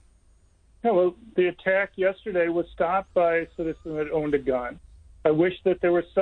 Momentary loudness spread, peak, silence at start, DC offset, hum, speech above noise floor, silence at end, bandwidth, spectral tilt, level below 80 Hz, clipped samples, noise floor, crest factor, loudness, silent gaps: 7 LU; -8 dBFS; 0.85 s; under 0.1%; none; 35 dB; 0 s; 4.2 kHz; -8.5 dB/octave; -52 dBFS; under 0.1%; -59 dBFS; 16 dB; -25 LUFS; none